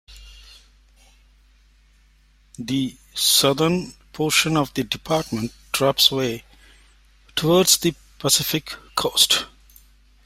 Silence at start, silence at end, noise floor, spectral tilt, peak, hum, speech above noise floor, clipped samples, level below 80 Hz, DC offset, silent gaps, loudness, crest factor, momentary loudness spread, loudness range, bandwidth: 0.1 s; 0.8 s; -56 dBFS; -3 dB/octave; -2 dBFS; none; 36 dB; under 0.1%; -50 dBFS; under 0.1%; none; -20 LUFS; 22 dB; 13 LU; 3 LU; 16 kHz